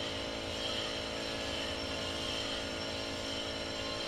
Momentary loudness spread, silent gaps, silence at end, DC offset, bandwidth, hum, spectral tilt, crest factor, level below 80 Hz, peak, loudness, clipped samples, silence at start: 2 LU; none; 0 s; under 0.1%; 15.5 kHz; none; -3 dB/octave; 12 dB; -54 dBFS; -24 dBFS; -36 LUFS; under 0.1%; 0 s